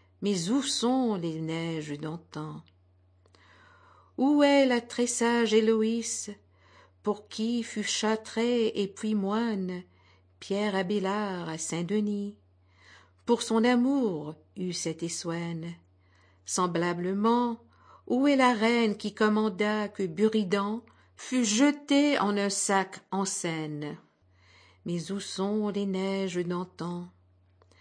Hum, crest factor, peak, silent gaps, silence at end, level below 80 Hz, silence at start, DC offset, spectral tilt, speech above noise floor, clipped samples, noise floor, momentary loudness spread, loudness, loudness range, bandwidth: none; 18 dB; -12 dBFS; none; 0.7 s; -76 dBFS; 0.2 s; under 0.1%; -4.5 dB/octave; 35 dB; under 0.1%; -63 dBFS; 14 LU; -28 LUFS; 6 LU; 10.5 kHz